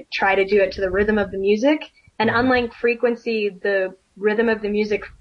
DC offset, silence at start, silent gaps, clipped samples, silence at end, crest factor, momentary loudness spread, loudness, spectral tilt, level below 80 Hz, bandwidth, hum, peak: under 0.1%; 0 s; none; under 0.1%; 0.15 s; 14 dB; 6 LU; -20 LUFS; -6 dB/octave; -46 dBFS; 6.8 kHz; none; -6 dBFS